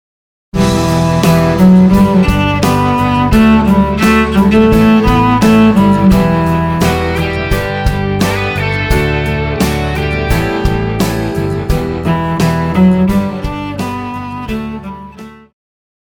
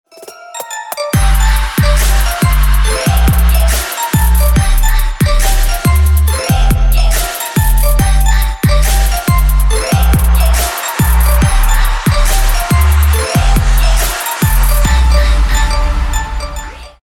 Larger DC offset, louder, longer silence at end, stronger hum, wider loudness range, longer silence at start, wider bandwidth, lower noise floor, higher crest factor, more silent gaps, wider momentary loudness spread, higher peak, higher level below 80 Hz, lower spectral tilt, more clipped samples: neither; about the same, -11 LUFS vs -12 LUFS; first, 0.7 s vs 0.15 s; neither; first, 6 LU vs 1 LU; first, 0.55 s vs 0.2 s; first, 20 kHz vs 17.5 kHz; about the same, -32 dBFS vs -33 dBFS; about the same, 10 dB vs 10 dB; neither; first, 12 LU vs 5 LU; about the same, 0 dBFS vs 0 dBFS; second, -22 dBFS vs -10 dBFS; first, -6.5 dB/octave vs -4.5 dB/octave; neither